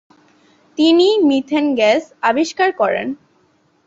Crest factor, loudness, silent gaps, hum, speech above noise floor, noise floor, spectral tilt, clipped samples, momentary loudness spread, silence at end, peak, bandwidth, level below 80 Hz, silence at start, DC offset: 14 dB; -15 LUFS; none; none; 43 dB; -58 dBFS; -3.5 dB/octave; under 0.1%; 12 LU; 0.7 s; -2 dBFS; 7.8 kHz; -64 dBFS; 0.8 s; under 0.1%